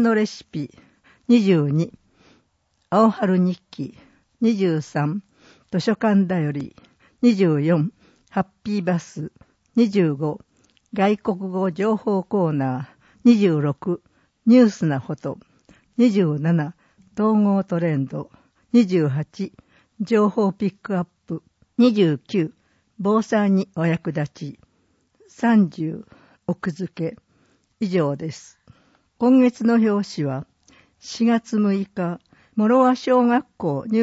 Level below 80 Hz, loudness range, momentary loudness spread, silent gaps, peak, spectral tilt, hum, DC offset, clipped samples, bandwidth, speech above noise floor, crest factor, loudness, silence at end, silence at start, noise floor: -64 dBFS; 4 LU; 16 LU; none; -4 dBFS; -7.5 dB/octave; none; under 0.1%; under 0.1%; 8 kHz; 48 dB; 18 dB; -21 LUFS; 0 s; 0 s; -68 dBFS